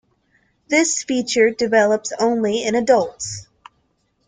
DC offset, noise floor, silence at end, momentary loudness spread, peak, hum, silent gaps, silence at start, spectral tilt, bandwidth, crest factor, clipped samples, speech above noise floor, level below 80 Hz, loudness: under 0.1%; -66 dBFS; 0.85 s; 10 LU; -2 dBFS; none; none; 0.7 s; -3 dB/octave; 9.6 kHz; 18 dB; under 0.1%; 48 dB; -58 dBFS; -18 LUFS